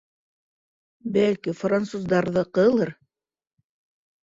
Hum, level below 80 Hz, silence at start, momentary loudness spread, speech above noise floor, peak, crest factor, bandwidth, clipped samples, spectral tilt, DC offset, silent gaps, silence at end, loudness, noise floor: none; -62 dBFS; 1.05 s; 7 LU; 55 dB; -8 dBFS; 18 dB; 7.8 kHz; under 0.1%; -7 dB/octave; under 0.1%; none; 1.3 s; -23 LUFS; -77 dBFS